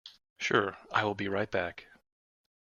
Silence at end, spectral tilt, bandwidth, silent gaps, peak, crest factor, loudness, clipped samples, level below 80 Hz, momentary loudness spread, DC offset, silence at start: 0.95 s; -4.5 dB/octave; 7.2 kHz; 0.30-0.36 s; -12 dBFS; 22 dB; -32 LUFS; under 0.1%; -68 dBFS; 9 LU; under 0.1%; 0.05 s